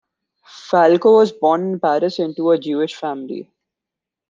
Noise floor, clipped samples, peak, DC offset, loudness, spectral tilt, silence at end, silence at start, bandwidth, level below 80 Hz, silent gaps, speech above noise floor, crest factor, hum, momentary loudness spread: -85 dBFS; under 0.1%; -2 dBFS; under 0.1%; -16 LUFS; -6.5 dB/octave; 0.85 s; 0.55 s; 7.4 kHz; -70 dBFS; none; 69 dB; 16 dB; none; 14 LU